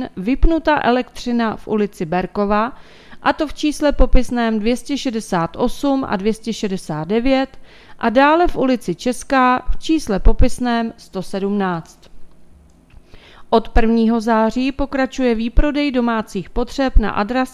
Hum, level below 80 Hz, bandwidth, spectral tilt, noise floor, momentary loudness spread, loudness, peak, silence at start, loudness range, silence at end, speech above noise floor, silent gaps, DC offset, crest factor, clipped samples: none; -24 dBFS; 13 kHz; -6 dB/octave; -46 dBFS; 7 LU; -18 LUFS; 0 dBFS; 0 s; 4 LU; 0.05 s; 29 dB; none; under 0.1%; 16 dB; under 0.1%